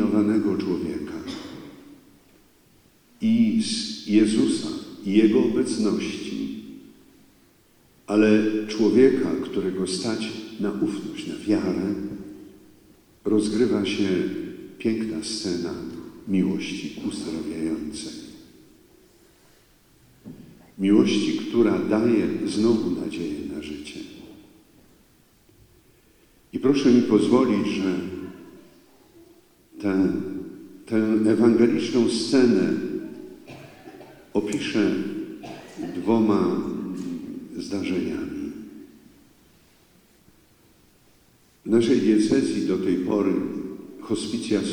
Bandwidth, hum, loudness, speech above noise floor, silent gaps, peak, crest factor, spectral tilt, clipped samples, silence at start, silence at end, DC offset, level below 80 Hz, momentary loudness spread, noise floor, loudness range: 12 kHz; none; -23 LUFS; 36 dB; none; -4 dBFS; 20 dB; -6 dB/octave; under 0.1%; 0 s; 0 s; under 0.1%; -60 dBFS; 20 LU; -58 dBFS; 10 LU